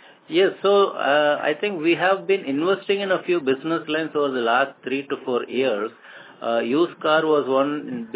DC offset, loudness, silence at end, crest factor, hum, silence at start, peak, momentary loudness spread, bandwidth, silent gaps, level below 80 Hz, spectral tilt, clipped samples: under 0.1%; -21 LUFS; 0 s; 16 dB; none; 0.3 s; -6 dBFS; 7 LU; 4 kHz; none; -80 dBFS; -9 dB/octave; under 0.1%